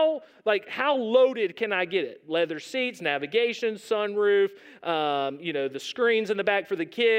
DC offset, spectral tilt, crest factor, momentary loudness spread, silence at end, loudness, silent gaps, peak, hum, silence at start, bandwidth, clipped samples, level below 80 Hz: under 0.1%; -4 dB/octave; 16 dB; 7 LU; 0 s; -26 LUFS; none; -8 dBFS; none; 0 s; 15 kHz; under 0.1%; -86 dBFS